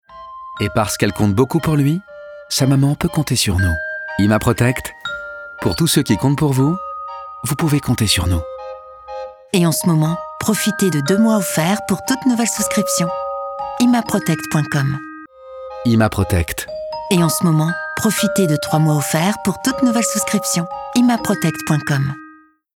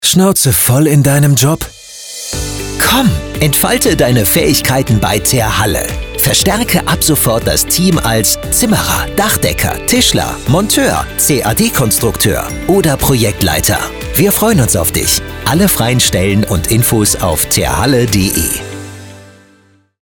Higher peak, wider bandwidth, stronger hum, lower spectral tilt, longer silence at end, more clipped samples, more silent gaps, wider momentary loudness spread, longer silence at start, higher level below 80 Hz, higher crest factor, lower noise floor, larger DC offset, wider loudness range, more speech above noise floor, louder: about the same, -2 dBFS vs 0 dBFS; about the same, 19.5 kHz vs over 20 kHz; neither; about the same, -5 dB/octave vs -4 dB/octave; second, 0.45 s vs 0.8 s; neither; neither; first, 13 LU vs 7 LU; about the same, 0.1 s vs 0 s; second, -42 dBFS vs -28 dBFS; about the same, 16 dB vs 12 dB; second, -45 dBFS vs -49 dBFS; second, under 0.1% vs 0.2%; about the same, 2 LU vs 1 LU; second, 29 dB vs 38 dB; second, -17 LUFS vs -11 LUFS